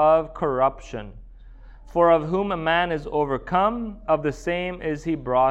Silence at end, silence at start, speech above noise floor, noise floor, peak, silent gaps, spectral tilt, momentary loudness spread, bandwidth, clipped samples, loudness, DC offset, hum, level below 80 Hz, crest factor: 0 s; 0 s; 21 dB; -44 dBFS; -6 dBFS; none; -6.5 dB/octave; 11 LU; 8.4 kHz; under 0.1%; -23 LUFS; under 0.1%; none; -42 dBFS; 18 dB